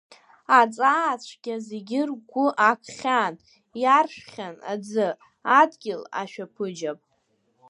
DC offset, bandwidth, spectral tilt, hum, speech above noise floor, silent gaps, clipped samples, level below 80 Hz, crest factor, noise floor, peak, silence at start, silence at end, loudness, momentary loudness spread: under 0.1%; 11 kHz; -4 dB/octave; none; 46 dB; none; under 0.1%; -80 dBFS; 22 dB; -70 dBFS; -4 dBFS; 0.5 s; 0.75 s; -23 LUFS; 15 LU